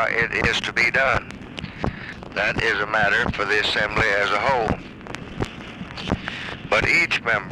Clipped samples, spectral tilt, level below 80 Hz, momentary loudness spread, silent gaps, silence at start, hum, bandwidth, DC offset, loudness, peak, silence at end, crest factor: under 0.1%; -4 dB/octave; -40 dBFS; 16 LU; none; 0 s; none; 15 kHz; under 0.1%; -21 LUFS; -2 dBFS; 0 s; 20 dB